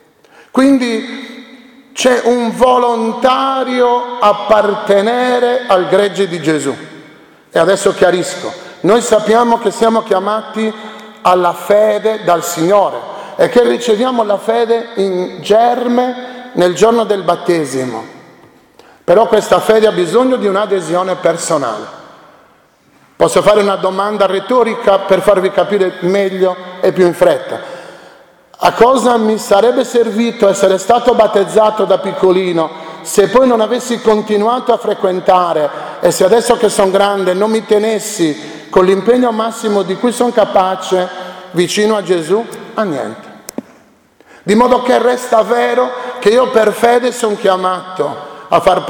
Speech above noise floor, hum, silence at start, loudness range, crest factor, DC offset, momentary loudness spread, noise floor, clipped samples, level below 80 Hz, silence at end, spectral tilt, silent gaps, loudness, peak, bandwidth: 37 dB; none; 0.55 s; 3 LU; 12 dB; under 0.1%; 10 LU; -49 dBFS; 0.2%; -50 dBFS; 0 s; -4.5 dB/octave; none; -12 LUFS; 0 dBFS; 19 kHz